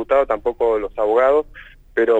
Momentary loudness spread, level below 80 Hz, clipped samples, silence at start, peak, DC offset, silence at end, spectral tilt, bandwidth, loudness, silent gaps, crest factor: 8 LU; -44 dBFS; under 0.1%; 0 s; -6 dBFS; under 0.1%; 0 s; -6 dB/octave; 7.8 kHz; -19 LUFS; none; 12 dB